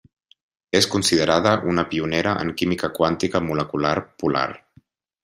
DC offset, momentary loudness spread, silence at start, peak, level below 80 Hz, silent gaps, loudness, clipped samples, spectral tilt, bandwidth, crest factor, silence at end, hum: under 0.1%; 6 LU; 0.75 s; -2 dBFS; -54 dBFS; none; -21 LUFS; under 0.1%; -4.5 dB/octave; 15.5 kHz; 20 dB; 0.65 s; none